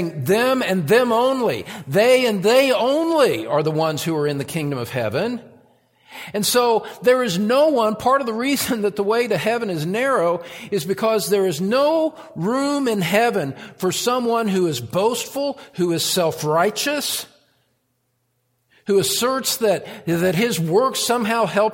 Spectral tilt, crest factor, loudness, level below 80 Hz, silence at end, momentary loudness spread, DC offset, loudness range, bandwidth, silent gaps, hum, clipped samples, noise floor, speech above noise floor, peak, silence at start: -4 dB/octave; 16 dB; -19 LUFS; -62 dBFS; 0 s; 8 LU; under 0.1%; 5 LU; 17 kHz; none; none; under 0.1%; -69 dBFS; 50 dB; -4 dBFS; 0 s